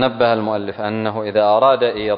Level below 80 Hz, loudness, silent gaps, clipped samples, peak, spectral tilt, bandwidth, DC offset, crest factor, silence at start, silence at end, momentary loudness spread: -54 dBFS; -17 LUFS; none; under 0.1%; -2 dBFS; -9 dB/octave; 5.2 kHz; under 0.1%; 14 dB; 0 s; 0 s; 9 LU